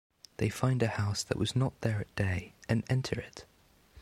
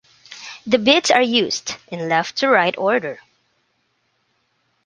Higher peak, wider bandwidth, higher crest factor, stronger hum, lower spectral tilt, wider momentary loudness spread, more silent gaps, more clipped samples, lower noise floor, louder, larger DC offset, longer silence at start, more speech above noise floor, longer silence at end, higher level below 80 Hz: second, -12 dBFS vs -2 dBFS; first, 14.5 kHz vs 10 kHz; about the same, 20 dB vs 20 dB; neither; first, -5.5 dB/octave vs -3 dB/octave; second, 9 LU vs 19 LU; neither; neither; second, -59 dBFS vs -67 dBFS; second, -32 LUFS vs -17 LUFS; neither; about the same, 0.4 s vs 0.3 s; second, 28 dB vs 49 dB; second, 0 s vs 1.7 s; first, -56 dBFS vs -64 dBFS